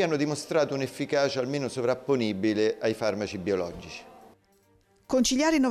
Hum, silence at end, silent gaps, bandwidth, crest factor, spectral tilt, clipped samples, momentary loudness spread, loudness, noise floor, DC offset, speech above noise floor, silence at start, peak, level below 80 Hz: none; 0 s; none; 15 kHz; 14 dB; -4.5 dB/octave; under 0.1%; 8 LU; -27 LUFS; -64 dBFS; under 0.1%; 37 dB; 0 s; -14 dBFS; -58 dBFS